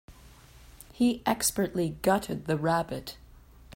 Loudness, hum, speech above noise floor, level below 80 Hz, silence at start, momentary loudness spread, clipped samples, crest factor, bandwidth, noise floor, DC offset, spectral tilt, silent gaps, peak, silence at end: -28 LUFS; none; 25 dB; -54 dBFS; 0.1 s; 8 LU; under 0.1%; 18 dB; 16.5 kHz; -53 dBFS; under 0.1%; -4.5 dB/octave; none; -12 dBFS; 0 s